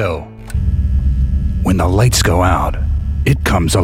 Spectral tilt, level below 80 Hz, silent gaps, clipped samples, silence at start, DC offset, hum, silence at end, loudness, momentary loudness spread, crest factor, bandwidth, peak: -5.5 dB/octave; -18 dBFS; none; under 0.1%; 0 s; 0.2%; none; 0 s; -15 LUFS; 8 LU; 12 dB; 16 kHz; -2 dBFS